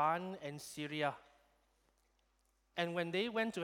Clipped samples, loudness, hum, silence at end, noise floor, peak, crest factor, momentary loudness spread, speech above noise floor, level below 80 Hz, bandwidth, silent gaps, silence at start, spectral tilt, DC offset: under 0.1%; -40 LUFS; none; 0 s; -77 dBFS; -22 dBFS; 20 dB; 10 LU; 38 dB; -78 dBFS; 18.5 kHz; none; 0 s; -4.5 dB/octave; under 0.1%